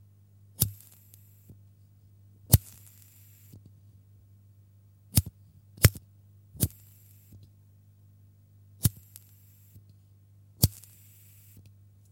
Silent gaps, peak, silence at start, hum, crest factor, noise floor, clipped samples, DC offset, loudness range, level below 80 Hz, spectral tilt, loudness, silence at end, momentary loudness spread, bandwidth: none; -2 dBFS; 0.6 s; 50 Hz at -50 dBFS; 32 dB; -58 dBFS; under 0.1%; under 0.1%; 8 LU; -46 dBFS; -4 dB/octave; -27 LUFS; 1.4 s; 29 LU; 17 kHz